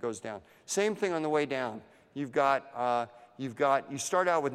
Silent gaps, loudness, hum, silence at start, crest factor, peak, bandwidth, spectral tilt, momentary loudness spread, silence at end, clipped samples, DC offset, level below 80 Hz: none; -31 LUFS; none; 0 s; 18 dB; -14 dBFS; 14.5 kHz; -4 dB/octave; 14 LU; 0 s; under 0.1%; under 0.1%; -76 dBFS